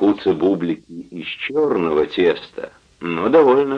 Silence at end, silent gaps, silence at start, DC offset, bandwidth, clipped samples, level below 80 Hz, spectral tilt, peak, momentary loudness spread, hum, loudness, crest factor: 0 s; none; 0 s; under 0.1%; 7 kHz; under 0.1%; -54 dBFS; -7.5 dB/octave; -2 dBFS; 19 LU; none; -18 LUFS; 16 dB